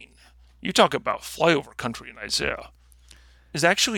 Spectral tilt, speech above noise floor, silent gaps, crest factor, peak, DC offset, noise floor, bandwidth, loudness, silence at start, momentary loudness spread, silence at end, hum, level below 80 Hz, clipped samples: -3 dB/octave; 30 dB; none; 22 dB; -4 dBFS; under 0.1%; -54 dBFS; 19 kHz; -24 LUFS; 0 s; 14 LU; 0 s; none; -52 dBFS; under 0.1%